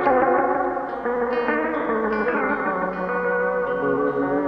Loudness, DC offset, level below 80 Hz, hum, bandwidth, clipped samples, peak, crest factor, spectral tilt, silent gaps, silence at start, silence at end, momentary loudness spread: -22 LUFS; under 0.1%; -52 dBFS; none; 5.6 kHz; under 0.1%; -6 dBFS; 16 dB; -8.5 dB/octave; none; 0 s; 0 s; 5 LU